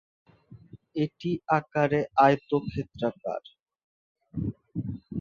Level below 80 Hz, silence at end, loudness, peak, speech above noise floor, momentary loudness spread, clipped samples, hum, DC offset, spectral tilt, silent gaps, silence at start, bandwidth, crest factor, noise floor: -56 dBFS; 0 s; -28 LUFS; -6 dBFS; 24 dB; 14 LU; under 0.1%; none; under 0.1%; -8 dB/octave; 3.62-3.66 s, 3.84-4.15 s; 0.5 s; 7.2 kHz; 22 dB; -51 dBFS